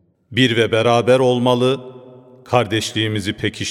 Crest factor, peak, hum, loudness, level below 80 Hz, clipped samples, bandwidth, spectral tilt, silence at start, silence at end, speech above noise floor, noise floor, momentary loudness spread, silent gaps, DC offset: 18 dB; 0 dBFS; none; -17 LUFS; -56 dBFS; under 0.1%; 14 kHz; -5 dB/octave; 0.3 s; 0 s; 26 dB; -42 dBFS; 8 LU; none; under 0.1%